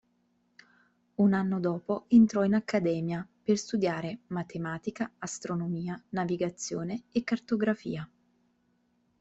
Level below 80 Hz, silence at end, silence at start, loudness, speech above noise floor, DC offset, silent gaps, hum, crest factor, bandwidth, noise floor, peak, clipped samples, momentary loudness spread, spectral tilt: -68 dBFS; 1.15 s; 1.2 s; -30 LUFS; 43 dB; under 0.1%; none; none; 18 dB; 8.2 kHz; -72 dBFS; -12 dBFS; under 0.1%; 12 LU; -6.5 dB/octave